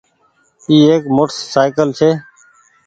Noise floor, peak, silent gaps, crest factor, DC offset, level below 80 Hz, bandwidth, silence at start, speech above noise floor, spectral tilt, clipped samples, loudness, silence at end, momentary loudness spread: -57 dBFS; 0 dBFS; none; 14 dB; under 0.1%; -56 dBFS; 8.8 kHz; 0.7 s; 45 dB; -6 dB/octave; under 0.1%; -13 LUFS; 0.65 s; 7 LU